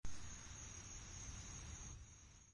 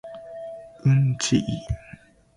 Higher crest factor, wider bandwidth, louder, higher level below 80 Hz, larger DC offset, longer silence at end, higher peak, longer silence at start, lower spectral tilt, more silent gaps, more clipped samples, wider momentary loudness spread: about the same, 16 dB vs 16 dB; about the same, 11.5 kHz vs 11 kHz; second, -54 LUFS vs -23 LUFS; second, -58 dBFS vs -44 dBFS; neither; second, 0 s vs 0.45 s; second, -34 dBFS vs -8 dBFS; about the same, 0 s vs 0.05 s; second, -2.5 dB/octave vs -5.5 dB/octave; neither; neither; second, 6 LU vs 18 LU